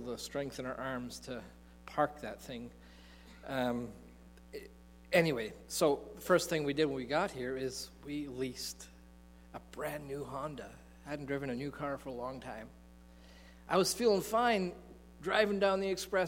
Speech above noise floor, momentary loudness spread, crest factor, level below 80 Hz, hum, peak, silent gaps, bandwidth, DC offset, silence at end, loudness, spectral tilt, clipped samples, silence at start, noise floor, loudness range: 22 dB; 22 LU; 24 dB; -60 dBFS; 60 Hz at -60 dBFS; -12 dBFS; none; 16.5 kHz; under 0.1%; 0 s; -35 LUFS; -4.5 dB/octave; under 0.1%; 0 s; -57 dBFS; 9 LU